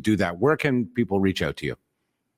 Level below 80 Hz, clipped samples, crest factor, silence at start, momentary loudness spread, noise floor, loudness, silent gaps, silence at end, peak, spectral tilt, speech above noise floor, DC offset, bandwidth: -54 dBFS; under 0.1%; 18 dB; 0.05 s; 11 LU; -76 dBFS; -24 LUFS; none; 0.65 s; -8 dBFS; -6.5 dB/octave; 53 dB; under 0.1%; 16 kHz